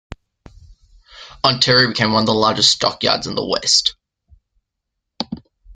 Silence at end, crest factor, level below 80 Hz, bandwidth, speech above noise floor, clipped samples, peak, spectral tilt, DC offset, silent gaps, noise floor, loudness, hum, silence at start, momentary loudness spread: 0.05 s; 20 dB; -48 dBFS; 12 kHz; 62 dB; under 0.1%; 0 dBFS; -3 dB/octave; under 0.1%; none; -78 dBFS; -15 LUFS; none; 0.7 s; 16 LU